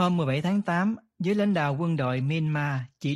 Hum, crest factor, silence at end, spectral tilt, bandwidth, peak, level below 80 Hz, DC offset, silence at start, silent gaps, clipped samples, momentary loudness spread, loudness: none; 16 dB; 0 s; -7.5 dB/octave; 11 kHz; -10 dBFS; -64 dBFS; under 0.1%; 0 s; none; under 0.1%; 5 LU; -27 LUFS